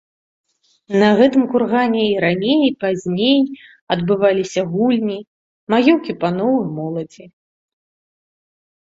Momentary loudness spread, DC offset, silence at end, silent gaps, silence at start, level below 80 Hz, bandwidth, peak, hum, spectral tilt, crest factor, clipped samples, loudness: 11 LU; under 0.1%; 1.55 s; 3.81-3.87 s, 5.27-5.67 s; 0.9 s; -58 dBFS; 7.8 kHz; -2 dBFS; none; -6.5 dB/octave; 16 dB; under 0.1%; -17 LUFS